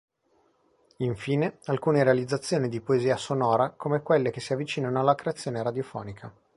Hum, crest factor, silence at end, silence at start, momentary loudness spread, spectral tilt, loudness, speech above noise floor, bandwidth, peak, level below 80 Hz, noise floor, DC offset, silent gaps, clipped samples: none; 20 dB; 0.25 s; 1 s; 9 LU; -6.5 dB/octave; -27 LUFS; 41 dB; 11.5 kHz; -8 dBFS; -64 dBFS; -68 dBFS; under 0.1%; none; under 0.1%